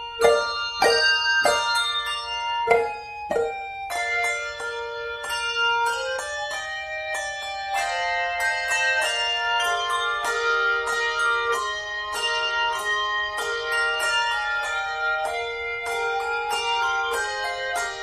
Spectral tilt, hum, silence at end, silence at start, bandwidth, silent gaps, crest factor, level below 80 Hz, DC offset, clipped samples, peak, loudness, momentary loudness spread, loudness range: 0 dB/octave; none; 0 s; 0 s; 15.5 kHz; none; 20 dB; -54 dBFS; under 0.1%; under 0.1%; -4 dBFS; -23 LUFS; 8 LU; 4 LU